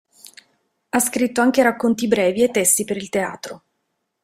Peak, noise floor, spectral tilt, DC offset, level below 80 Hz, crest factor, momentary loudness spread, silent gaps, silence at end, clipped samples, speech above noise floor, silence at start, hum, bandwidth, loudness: -2 dBFS; -74 dBFS; -3 dB/octave; under 0.1%; -60 dBFS; 18 dB; 9 LU; none; 0.65 s; under 0.1%; 55 dB; 0.95 s; none; 16 kHz; -18 LUFS